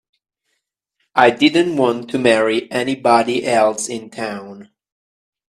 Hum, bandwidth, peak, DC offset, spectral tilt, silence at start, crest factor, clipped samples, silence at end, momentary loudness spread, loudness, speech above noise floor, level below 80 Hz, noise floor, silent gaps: none; 13.5 kHz; 0 dBFS; under 0.1%; -4 dB/octave; 1.15 s; 18 dB; under 0.1%; 0.85 s; 12 LU; -16 LUFS; 57 dB; -62 dBFS; -74 dBFS; none